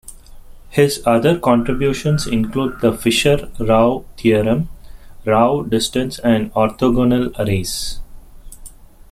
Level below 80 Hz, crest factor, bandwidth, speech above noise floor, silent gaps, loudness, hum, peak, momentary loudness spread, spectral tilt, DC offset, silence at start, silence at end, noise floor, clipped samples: -34 dBFS; 16 dB; 15.5 kHz; 22 dB; none; -17 LUFS; none; -2 dBFS; 7 LU; -5.5 dB/octave; under 0.1%; 0.05 s; 0.45 s; -38 dBFS; under 0.1%